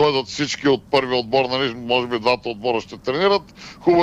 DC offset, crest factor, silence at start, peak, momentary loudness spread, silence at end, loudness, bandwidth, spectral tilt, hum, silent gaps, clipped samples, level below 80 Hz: under 0.1%; 16 dB; 0 s; -4 dBFS; 5 LU; 0 s; -20 LUFS; 9.8 kHz; -4.5 dB/octave; none; none; under 0.1%; -52 dBFS